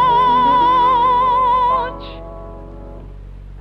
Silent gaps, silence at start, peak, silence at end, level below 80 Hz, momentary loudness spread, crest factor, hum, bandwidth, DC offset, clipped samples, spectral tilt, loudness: none; 0 s; -6 dBFS; 0 s; -36 dBFS; 23 LU; 10 dB; none; 5.8 kHz; under 0.1%; under 0.1%; -6.5 dB/octave; -13 LUFS